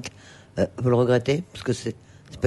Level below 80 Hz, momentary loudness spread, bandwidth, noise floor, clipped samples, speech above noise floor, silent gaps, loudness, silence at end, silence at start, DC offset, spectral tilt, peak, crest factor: -54 dBFS; 16 LU; 11.5 kHz; -46 dBFS; under 0.1%; 23 dB; none; -24 LUFS; 0 s; 0 s; under 0.1%; -6.5 dB/octave; -8 dBFS; 18 dB